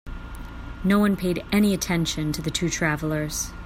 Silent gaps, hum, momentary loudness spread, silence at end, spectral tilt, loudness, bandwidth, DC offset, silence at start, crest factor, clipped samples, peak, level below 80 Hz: none; none; 18 LU; 0 s; -4.5 dB/octave; -24 LUFS; 16 kHz; under 0.1%; 0.05 s; 16 dB; under 0.1%; -8 dBFS; -38 dBFS